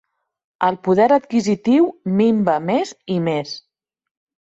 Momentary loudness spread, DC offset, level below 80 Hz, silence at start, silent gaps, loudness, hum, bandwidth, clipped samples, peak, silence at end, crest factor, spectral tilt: 8 LU; under 0.1%; -62 dBFS; 0.6 s; none; -18 LUFS; none; 8 kHz; under 0.1%; -4 dBFS; 0.95 s; 16 dB; -6.5 dB/octave